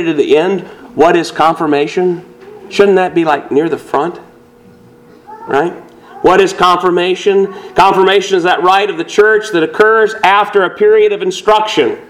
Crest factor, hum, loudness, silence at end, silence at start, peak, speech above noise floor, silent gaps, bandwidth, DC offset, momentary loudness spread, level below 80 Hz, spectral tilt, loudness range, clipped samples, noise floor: 12 dB; none; -11 LUFS; 0.05 s; 0 s; 0 dBFS; 30 dB; none; 13 kHz; under 0.1%; 8 LU; -50 dBFS; -4.5 dB/octave; 5 LU; 0.4%; -41 dBFS